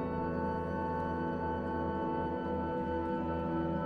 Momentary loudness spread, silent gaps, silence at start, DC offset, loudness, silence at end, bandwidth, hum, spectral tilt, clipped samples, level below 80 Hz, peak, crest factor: 1 LU; none; 0 s; under 0.1%; -35 LUFS; 0 s; 6.4 kHz; none; -9.5 dB/octave; under 0.1%; -50 dBFS; -24 dBFS; 12 dB